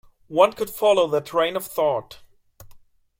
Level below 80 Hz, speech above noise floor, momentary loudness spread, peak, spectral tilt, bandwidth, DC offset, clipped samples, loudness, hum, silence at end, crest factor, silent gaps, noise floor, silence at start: -60 dBFS; 28 dB; 6 LU; -2 dBFS; -4 dB/octave; 16.5 kHz; under 0.1%; under 0.1%; -21 LUFS; none; 0.45 s; 22 dB; none; -49 dBFS; 0.3 s